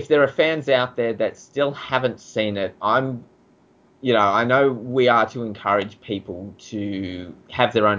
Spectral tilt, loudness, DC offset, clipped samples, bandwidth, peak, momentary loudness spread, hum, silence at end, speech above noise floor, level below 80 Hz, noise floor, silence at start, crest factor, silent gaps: -6 dB/octave; -21 LUFS; under 0.1%; under 0.1%; 7.6 kHz; -4 dBFS; 13 LU; none; 0 s; 35 dB; -56 dBFS; -56 dBFS; 0 s; 18 dB; none